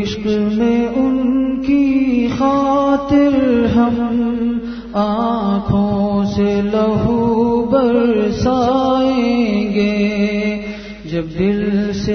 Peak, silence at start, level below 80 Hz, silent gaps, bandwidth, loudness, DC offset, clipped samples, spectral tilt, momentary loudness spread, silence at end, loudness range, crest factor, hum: -2 dBFS; 0 s; -38 dBFS; none; 6.6 kHz; -16 LUFS; under 0.1%; under 0.1%; -7.5 dB/octave; 6 LU; 0 s; 2 LU; 14 dB; none